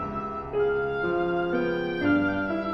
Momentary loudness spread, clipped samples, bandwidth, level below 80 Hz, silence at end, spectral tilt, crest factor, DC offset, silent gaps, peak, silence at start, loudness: 6 LU; under 0.1%; 6 kHz; -48 dBFS; 0 s; -8.5 dB/octave; 14 dB; under 0.1%; none; -12 dBFS; 0 s; -26 LUFS